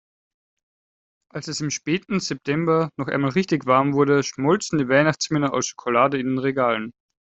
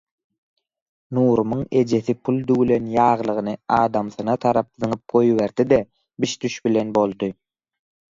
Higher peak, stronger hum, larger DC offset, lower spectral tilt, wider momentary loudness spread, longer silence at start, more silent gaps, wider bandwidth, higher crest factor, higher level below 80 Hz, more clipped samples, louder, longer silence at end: about the same, -4 dBFS vs -2 dBFS; neither; neither; second, -5 dB/octave vs -6.5 dB/octave; about the same, 8 LU vs 8 LU; first, 1.35 s vs 1.1 s; neither; about the same, 8.2 kHz vs 7.6 kHz; about the same, 20 dB vs 18 dB; second, -62 dBFS vs -54 dBFS; neither; about the same, -21 LUFS vs -21 LUFS; second, 0.45 s vs 0.8 s